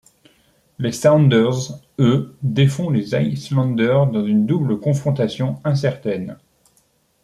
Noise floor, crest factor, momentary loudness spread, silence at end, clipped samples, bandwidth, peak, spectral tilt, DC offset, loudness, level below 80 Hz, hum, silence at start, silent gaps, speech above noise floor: -61 dBFS; 16 dB; 11 LU; 0.9 s; under 0.1%; 12 kHz; -2 dBFS; -7 dB/octave; under 0.1%; -18 LUFS; -56 dBFS; none; 0.8 s; none; 44 dB